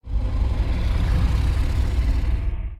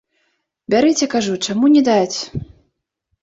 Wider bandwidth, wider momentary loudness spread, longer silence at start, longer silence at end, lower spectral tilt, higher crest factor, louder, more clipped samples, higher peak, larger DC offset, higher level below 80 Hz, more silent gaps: first, 9.2 kHz vs 8 kHz; second, 4 LU vs 12 LU; second, 0.05 s vs 0.7 s; second, 0 s vs 0.8 s; first, -7 dB/octave vs -4.5 dB/octave; about the same, 12 dB vs 14 dB; second, -24 LUFS vs -16 LUFS; neither; second, -8 dBFS vs -4 dBFS; neither; first, -22 dBFS vs -50 dBFS; neither